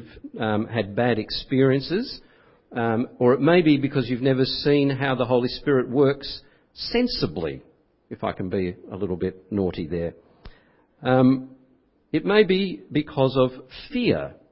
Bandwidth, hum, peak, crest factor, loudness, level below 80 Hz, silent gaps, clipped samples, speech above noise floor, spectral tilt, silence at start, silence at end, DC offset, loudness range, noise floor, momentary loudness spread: 5.8 kHz; none; -4 dBFS; 18 dB; -23 LUFS; -50 dBFS; none; under 0.1%; 38 dB; -10.5 dB/octave; 0 s; 0.2 s; under 0.1%; 7 LU; -61 dBFS; 13 LU